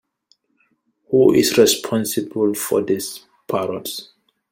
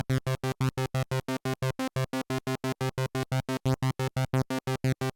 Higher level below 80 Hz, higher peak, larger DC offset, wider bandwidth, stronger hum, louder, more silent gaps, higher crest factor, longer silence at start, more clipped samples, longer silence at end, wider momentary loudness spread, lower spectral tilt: about the same, -58 dBFS vs -54 dBFS; first, -2 dBFS vs -18 dBFS; neither; about the same, 16.5 kHz vs 17.5 kHz; neither; first, -18 LUFS vs -31 LUFS; neither; first, 18 dB vs 12 dB; first, 1.1 s vs 0.1 s; neither; first, 0.5 s vs 0.05 s; first, 16 LU vs 3 LU; second, -4 dB/octave vs -6 dB/octave